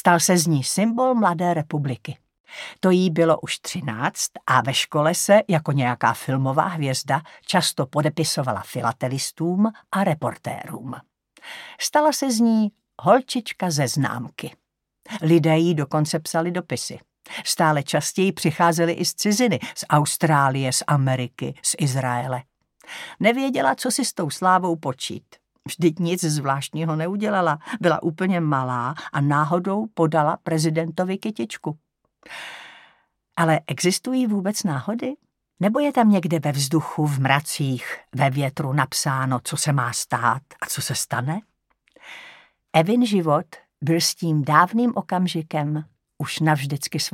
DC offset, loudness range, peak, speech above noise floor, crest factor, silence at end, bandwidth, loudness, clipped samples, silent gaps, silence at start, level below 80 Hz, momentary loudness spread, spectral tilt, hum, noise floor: under 0.1%; 4 LU; 0 dBFS; 40 dB; 22 dB; 0.05 s; 17 kHz; -22 LUFS; under 0.1%; 2.40-2.44 s; 0.05 s; -70 dBFS; 13 LU; -5 dB/octave; none; -62 dBFS